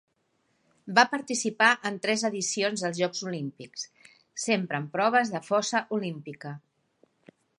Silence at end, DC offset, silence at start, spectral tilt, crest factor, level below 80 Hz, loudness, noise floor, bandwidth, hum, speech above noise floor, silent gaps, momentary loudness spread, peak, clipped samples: 1 s; under 0.1%; 0.85 s; -3 dB/octave; 26 dB; -80 dBFS; -27 LUFS; -73 dBFS; 11.5 kHz; none; 45 dB; none; 17 LU; -4 dBFS; under 0.1%